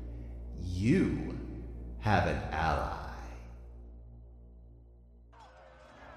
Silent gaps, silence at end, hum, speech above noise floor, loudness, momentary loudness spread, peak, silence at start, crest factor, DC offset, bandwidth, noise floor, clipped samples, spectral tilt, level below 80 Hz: none; 0 s; none; 27 dB; -33 LUFS; 26 LU; -14 dBFS; 0 s; 20 dB; under 0.1%; 13 kHz; -56 dBFS; under 0.1%; -7 dB/octave; -44 dBFS